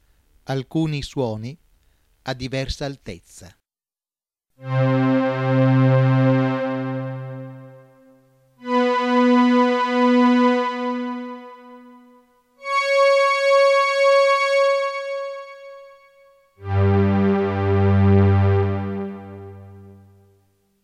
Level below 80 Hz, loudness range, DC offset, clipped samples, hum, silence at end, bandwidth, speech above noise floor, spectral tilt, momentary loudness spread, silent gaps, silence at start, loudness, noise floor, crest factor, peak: -50 dBFS; 10 LU; under 0.1%; under 0.1%; none; 0.9 s; 10.5 kHz; over 67 dB; -7 dB/octave; 20 LU; none; 0.5 s; -19 LUFS; under -90 dBFS; 14 dB; -6 dBFS